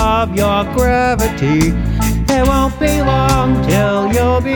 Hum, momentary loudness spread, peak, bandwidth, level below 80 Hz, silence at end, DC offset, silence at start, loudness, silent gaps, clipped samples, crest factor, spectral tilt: none; 3 LU; 0 dBFS; over 20 kHz; -22 dBFS; 0 s; under 0.1%; 0 s; -14 LUFS; none; under 0.1%; 12 dB; -6 dB/octave